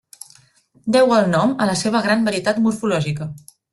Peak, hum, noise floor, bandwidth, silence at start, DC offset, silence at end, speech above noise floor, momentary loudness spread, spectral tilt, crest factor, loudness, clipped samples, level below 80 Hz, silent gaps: -4 dBFS; none; -55 dBFS; 12 kHz; 0.85 s; under 0.1%; 0.35 s; 38 dB; 11 LU; -5.5 dB/octave; 16 dB; -18 LUFS; under 0.1%; -56 dBFS; none